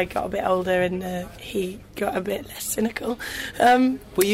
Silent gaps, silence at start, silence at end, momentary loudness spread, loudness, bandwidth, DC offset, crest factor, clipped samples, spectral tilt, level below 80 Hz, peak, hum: none; 0 s; 0 s; 12 LU; -24 LUFS; 16 kHz; under 0.1%; 18 dB; under 0.1%; -4 dB/octave; -48 dBFS; -6 dBFS; none